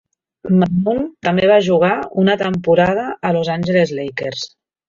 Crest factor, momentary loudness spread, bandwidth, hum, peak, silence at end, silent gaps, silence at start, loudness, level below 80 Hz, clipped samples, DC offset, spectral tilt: 14 dB; 11 LU; 7.2 kHz; none; -2 dBFS; 0.4 s; none; 0.45 s; -16 LUFS; -50 dBFS; under 0.1%; under 0.1%; -7 dB/octave